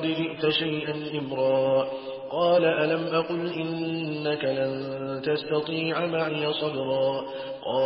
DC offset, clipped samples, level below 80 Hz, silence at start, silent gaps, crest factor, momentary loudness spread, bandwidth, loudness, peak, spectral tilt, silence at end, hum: under 0.1%; under 0.1%; -66 dBFS; 0 s; none; 14 dB; 9 LU; 5.8 kHz; -27 LUFS; -12 dBFS; -10 dB/octave; 0 s; none